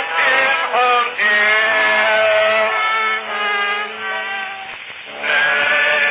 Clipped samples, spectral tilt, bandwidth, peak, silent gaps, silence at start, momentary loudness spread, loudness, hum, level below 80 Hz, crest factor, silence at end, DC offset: under 0.1%; -4.5 dB/octave; 4 kHz; -2 dBFS; none; 0 s; 11 LU; -15 LUFS; none; -68 dBFS; 14 dB; 0 s; under 0.1%